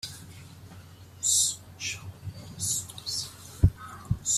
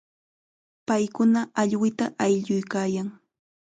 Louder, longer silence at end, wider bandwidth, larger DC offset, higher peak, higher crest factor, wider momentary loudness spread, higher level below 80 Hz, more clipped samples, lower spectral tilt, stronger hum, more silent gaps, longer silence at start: second, -28 LUFS vs -25 LUFS; second, 0 s vs 0.65 s; first, 15.5 kHz vs 9.4 kHz; neither; about the same, -8 dBFS vs -8 dBFS; first, 24 dB vs 16 dB; first, 24 LU vs 8 LU; first, -44 dBFS vs -70 dBFS; neither; second, -2.5 dB/octave vs -6 dB/octave; neither; neither; second, 0.05 s vs 0.9 s